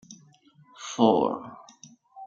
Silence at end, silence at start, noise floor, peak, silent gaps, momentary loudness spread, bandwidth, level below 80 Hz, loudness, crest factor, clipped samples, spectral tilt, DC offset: 0 s; 0.1 s; -58 dBFS; -6 dBFS; none; 23 LU; 7.6 kHz; -74 dBFS; -25 LUFS; 24 dB; under 0.1%; -5.5 dB/octave; under 0.1%